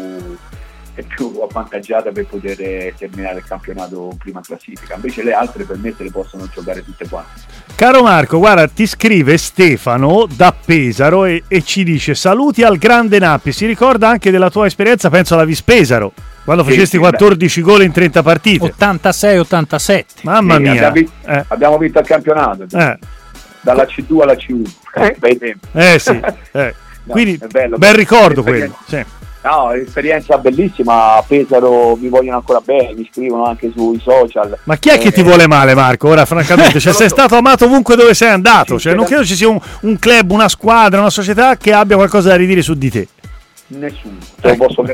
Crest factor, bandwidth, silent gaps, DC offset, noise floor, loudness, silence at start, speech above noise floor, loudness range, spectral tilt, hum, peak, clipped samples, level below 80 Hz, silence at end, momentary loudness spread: 10 dB; 17 kHz; none; under 0.1%; -35 dBFS; -9 LUFS; 0 s; 25 dB; 15 LU; -5 dB/octave; none; 0 dBFS; under 0.1%; -36 dBFS; 0 s; 17 LU